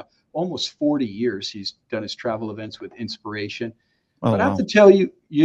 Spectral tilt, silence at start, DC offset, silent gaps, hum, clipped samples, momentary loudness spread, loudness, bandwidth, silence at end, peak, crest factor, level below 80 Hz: -6 dB/octave; 0.35 s; under 0.1%; none; none; under 0.1%; 19 LU; -21 LUFS; 8 kHz; 0 s; 0 dBFS; 20 dB; -60 dBFS